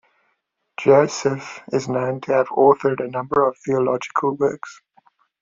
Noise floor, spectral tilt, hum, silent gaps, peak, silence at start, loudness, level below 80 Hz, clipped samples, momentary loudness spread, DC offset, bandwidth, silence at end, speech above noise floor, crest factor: -71 dBFS; -6 dB/octave; none; none; -2 dBFS; 0.8 s; -20 LUFS; -62 dBFS; under 0.1%; 10 LU; under 0.1%; 7.6 kHz; 0.7 s; 52 dB; 18 dB